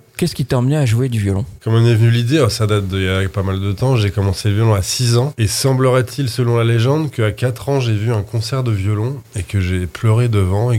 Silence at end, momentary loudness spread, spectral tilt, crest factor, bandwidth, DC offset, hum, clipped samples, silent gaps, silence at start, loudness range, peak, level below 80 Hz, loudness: 0 s; 6 LU; -6 dB/octave; 14 dB; 15.5 kHz; under 0.1%; none; under 0.1%; none; 0.2 s; 3 LU; -2 dBFS; -44 dBFS; -16 LUFS